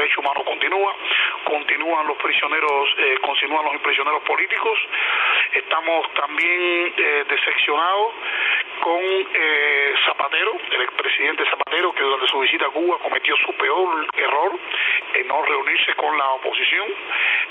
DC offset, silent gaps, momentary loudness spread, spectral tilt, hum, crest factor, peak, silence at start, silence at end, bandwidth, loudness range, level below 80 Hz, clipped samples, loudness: under 0.1%; none; 4 LU; -2.5 dB/octave; none; 16 dB; -4 dBFS; 0 s; 0 s; 8.8 kHz; 1 LU; -74 dBFS; under 0.1%; -19 LUFS